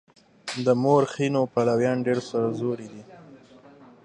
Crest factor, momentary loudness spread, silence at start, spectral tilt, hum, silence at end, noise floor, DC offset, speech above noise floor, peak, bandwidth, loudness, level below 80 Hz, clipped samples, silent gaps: 18 dB; 15 LU; 0.45 s; -6.5 dB/octave; none; 0.7 s; -50 dBFS; under 0.1%; 27 dB; -8 dBFS; 11 kHz; -24 LUFS; -68 dBFS; under 0.1%; none